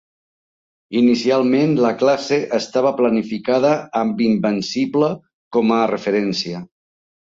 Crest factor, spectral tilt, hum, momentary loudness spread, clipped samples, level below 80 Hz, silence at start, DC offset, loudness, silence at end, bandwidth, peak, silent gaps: 14 dB; -6 dB/octave; none; 6 LU; under 0.1%; -62 dBFS; 0.9 s; under 0.1%; -18 LUFS; 0.55 s; 7.8 kHz; -4 dBFS; 5.34-5.51 s